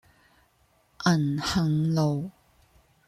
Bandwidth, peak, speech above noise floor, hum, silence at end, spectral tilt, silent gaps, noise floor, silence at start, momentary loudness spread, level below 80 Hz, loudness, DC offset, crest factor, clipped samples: 13.5 kHz; -10 dBFS; 41 dB; none; 0.8 s; -6 dB/octave; none; -65 dBFS; 1 s; 7 LU; -54 dBFS; -26 LUFS; under 0.1%; 18 dB; under 0.1%